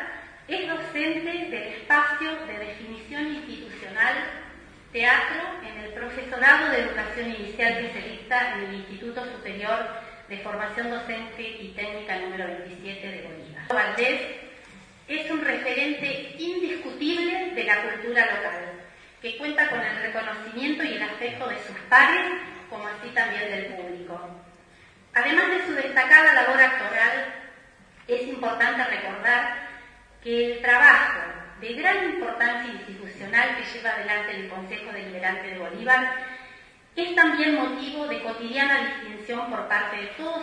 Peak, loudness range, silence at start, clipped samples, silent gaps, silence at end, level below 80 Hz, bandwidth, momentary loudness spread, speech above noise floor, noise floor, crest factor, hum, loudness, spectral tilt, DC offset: -2 dBFS; 10 LU; 0 s; under 0.1%; none; 0 s; -60 dBFS; 10.5 kHz; 18 LU; 29 dB; -53 dBFS; 24 dB; none; -23 LUFS; -4 dB/octave; under 0.1%